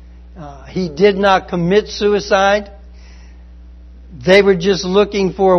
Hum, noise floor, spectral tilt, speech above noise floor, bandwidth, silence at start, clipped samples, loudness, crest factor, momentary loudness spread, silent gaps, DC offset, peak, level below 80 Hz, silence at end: none; -37 dBFS; -5.5 dB/octave; 24 dB; 6.4 kHz; 0.35 s; under 0.1%; -14 LUFS; 16 dB; 17 LU; none; under 0.1%; 0 dBFS; -36 dBFS; 0 s